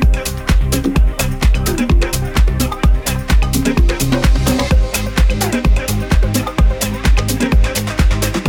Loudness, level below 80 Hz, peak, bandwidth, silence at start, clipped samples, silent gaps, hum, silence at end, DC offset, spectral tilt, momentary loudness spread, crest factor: -15 LUFS; -14 dBFS; 0 dBFS; 17.5 kHz; 0 s; under 0.1%; none; none; 0 s; under 0.1%; -5 dB/octave; 3 LU; 12 dB